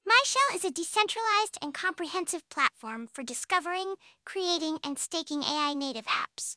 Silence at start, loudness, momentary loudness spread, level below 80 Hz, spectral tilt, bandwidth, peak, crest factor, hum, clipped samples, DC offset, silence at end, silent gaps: 0.05 s; -29 LUFS; 11 LU; -80 dBFS; 0 dB/octave; 11 kHz; -8 dBFS; 22 dB; none; under 0.1%; under 0.1%; 0 s; none